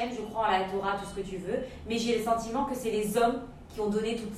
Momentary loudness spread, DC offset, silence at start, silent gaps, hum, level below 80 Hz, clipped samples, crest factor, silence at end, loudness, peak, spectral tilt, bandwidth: 8 LU; under 0.1%; 0 s; none; none; -52 dBFS; under 0.1%; 16 dB; 0 s; -30 LUFS; -14 dBFS; -4.5 dB/octave; 16 kHz